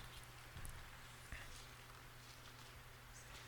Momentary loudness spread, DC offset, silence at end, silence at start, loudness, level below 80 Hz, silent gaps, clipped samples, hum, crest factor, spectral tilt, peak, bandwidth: 4 LU; under 0.1%; 0 s; 0 s; -56 LUFS; -60 dBFS; none; under 0.1%; none; 20 dB; -3 dB/octave; -34 dBFS; 19 kHz